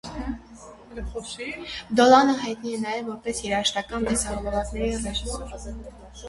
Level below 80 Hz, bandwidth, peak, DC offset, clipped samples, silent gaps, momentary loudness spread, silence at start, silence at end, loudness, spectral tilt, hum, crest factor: -40 dBFS; 11.5 kHz; -2 dBFS; under 0.1%; under 0.1%; none; 21 LU; 0.05 s; 0 s; -24 LUFS; -3.5 dB/octave; none; 24 dB